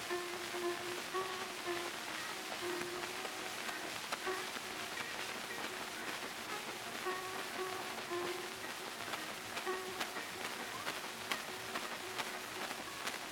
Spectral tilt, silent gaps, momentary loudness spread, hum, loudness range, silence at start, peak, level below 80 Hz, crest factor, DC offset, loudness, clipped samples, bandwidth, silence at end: -1.5 dB/octave; none; 2 LU; none; 1 LU; 0 s; -18 dBFS; -74 dBFS; 24 dB; under 0.1%; -41 LUFS; under 0.1%; 18 kHz; 0 s